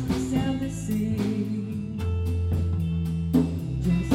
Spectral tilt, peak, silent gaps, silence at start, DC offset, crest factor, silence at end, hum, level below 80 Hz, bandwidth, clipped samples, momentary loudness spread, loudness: -7.5 dB/octave; -8 dBFS; none; 0 s; under 0.1%; 18 dB; 0 s; none; -38 dBFS; 16 kHz; under 0.1%; 5 LU; -27 LUFS